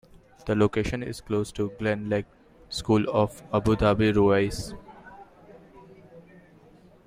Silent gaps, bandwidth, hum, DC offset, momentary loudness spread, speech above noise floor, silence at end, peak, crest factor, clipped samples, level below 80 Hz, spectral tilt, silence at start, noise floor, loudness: none; 15.5 kHz; none; under 0.1%; 18 LU; 29 dB; 0.85 s; -8 dBFS; 20 dB; under 0.1%; -46 dBFS; -6.5 dB/octave; 0.45 s; -54 dBFS; -25 LUFS